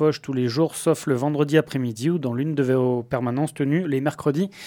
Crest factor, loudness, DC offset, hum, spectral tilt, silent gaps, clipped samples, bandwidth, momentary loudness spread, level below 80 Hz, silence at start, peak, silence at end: 18 dB; -23 LUFS; under 0.1%; none; -6.5 dB/octave; none; under 0.1%; 18 kHz; 4 LU; -62 dBFS; 0 s; -4 dBFS; 0 s